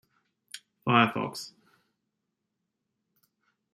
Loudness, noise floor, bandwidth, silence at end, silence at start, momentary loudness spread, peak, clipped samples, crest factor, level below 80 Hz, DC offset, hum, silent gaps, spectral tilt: -26 LUFS; -83 dBFS; 15 kHz; 2.25 s; 0.55 s; 23 LU; -6 dBFS; under 0.1%; 28 dB; -74 dBFS; under 0.1%; none; none; -5 dB/octave